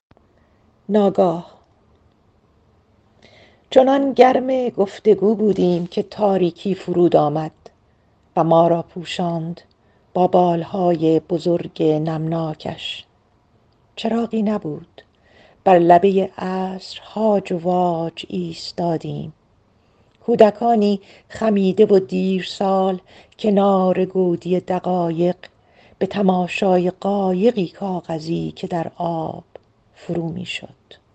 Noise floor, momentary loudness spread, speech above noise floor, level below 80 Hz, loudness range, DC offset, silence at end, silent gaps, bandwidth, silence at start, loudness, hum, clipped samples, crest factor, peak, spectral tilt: -58 dBFS; 13 LU; 40 dB; -60 dBFS; 6 LU; under 0.1%; 0.5 s; none; 8.6 kHz; 0.9 s; -19 LUFS; none; under 0.1%; 20 dB; 0 dBFS; -7.5 dB/octave